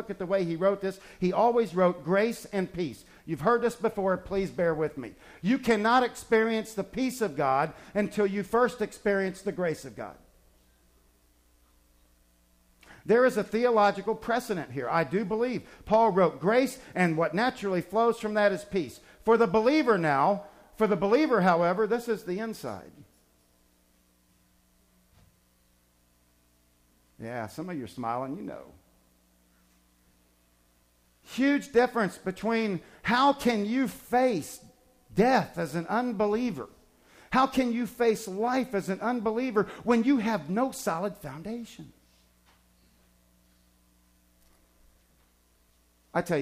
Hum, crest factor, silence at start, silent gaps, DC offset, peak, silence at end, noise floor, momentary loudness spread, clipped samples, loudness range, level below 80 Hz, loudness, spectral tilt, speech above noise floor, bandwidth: 60 Hz at -55 dBFS; 18 dB; 0 s; none; under 0.1%; -12 dBFS; 0 s; -66 dBFS; 14 LU; under 0.1%; 13 LU; -60 dBFS; -27 LUFS; -6 dB/octave; 39 dB; 15.5 kHz